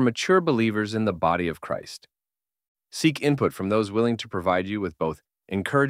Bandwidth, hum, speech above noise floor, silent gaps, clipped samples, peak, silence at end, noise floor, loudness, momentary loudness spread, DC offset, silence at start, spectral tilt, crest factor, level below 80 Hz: 16 kHz; none; over 66 dB; 2.68-2.75 s; under 0.1%; -6 dBFS; 0 s; under -90 dBFS; -25 LUFS; 11 LU; under 0.1%; 0 s; -6 dB/octave; 18 dB; -58 dBFS